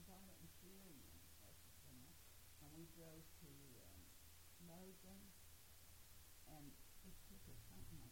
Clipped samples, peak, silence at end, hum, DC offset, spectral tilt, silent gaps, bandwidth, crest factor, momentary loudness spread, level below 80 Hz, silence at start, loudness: under 0.1%; -46 dBFS; 0 s; none; under 0.1%; -4 dB/octave; none; 16.5 kHz; 16 dB; 4 LU; -70 dBFS; 0 s; -63 LUFS